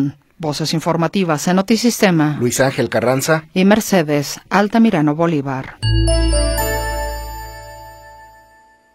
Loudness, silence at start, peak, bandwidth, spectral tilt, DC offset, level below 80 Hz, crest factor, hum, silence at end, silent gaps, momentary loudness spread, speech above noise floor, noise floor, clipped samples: -16 LUFS; 0 s; 0 dBFS; 16.5 kHz; -5 dB/octave; under 0.1%; -26 dBFS; 16 dB; none; 0.7 s; none; 12 LU; 34 dB; -50 dBFS; under 0.1%